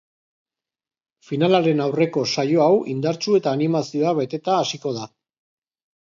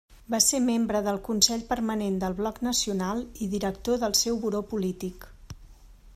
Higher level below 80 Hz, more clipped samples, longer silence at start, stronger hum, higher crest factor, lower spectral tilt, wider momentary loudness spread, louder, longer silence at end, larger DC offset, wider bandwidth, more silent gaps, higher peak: second, -70 dBFS vs -50 dBFS; neither; first, 1.3 s vs 0.1 s; neither; about the same, 20 dB vs 22 dB; first, -6 dB/octave vs -3 dB/octave; about the same, 10 LU vs 10 LU; first, -20 LUFS vs -26 LUFS; first, 1.05 s vs 0.05 s; neither; second, 7.6 kHz vs 15.5 kHz; neither; first, -2 dBFS vs -6 dBFS